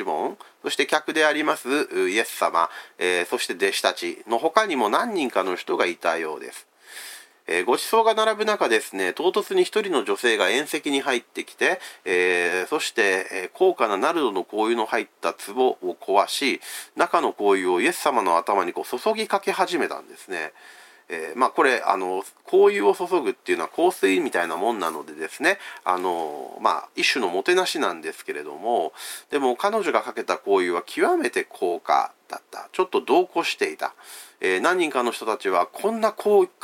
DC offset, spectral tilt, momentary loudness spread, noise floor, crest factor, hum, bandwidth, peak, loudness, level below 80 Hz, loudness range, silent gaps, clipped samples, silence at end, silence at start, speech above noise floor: under 0.1%; -2.5 dB/octave; 11 LU; -42 dBFS; 20 dB; none; 17 kHz; -2 dBFS; -23 LUFS; -82 dBFS; 3 LU; none; under 0.1%; 0.15 s; 0 s; 19 dB